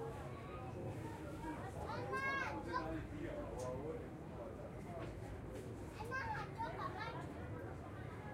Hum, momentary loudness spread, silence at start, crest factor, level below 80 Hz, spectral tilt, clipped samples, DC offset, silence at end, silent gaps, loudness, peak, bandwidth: none; 8 LU; 0 s; 16 dB; -58 dBFS; -6.5 dB/octave; under 0.1%; under 0.1%; 0 s; none; -46 LUFS; -28 dBFS; 16 kHz